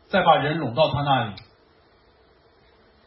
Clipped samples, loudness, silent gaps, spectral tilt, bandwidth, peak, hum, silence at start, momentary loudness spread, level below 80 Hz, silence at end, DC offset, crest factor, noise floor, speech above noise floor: under 0.1%; -21 LUFS; none; -10.5 dB/octave; 5.8 kHz; -2 dBFS; none; 0.1 s; 12 LU; -54 dBFS; 1.65 s; under 0.1%; 22 dB; -57 dBFS; 37 dB